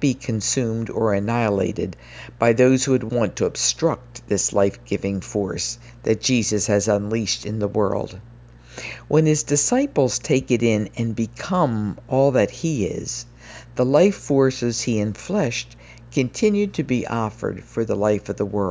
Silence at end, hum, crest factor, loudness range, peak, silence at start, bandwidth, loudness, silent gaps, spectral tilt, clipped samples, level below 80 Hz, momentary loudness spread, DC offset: 0 s; none; 18 dB; 2 LU; -2 dBFS; 0 s; 8 kHz; -21 LUFS; none; -5 dB/octave; under 0.1%; -48 dBFS; 11 LU; under 0.1%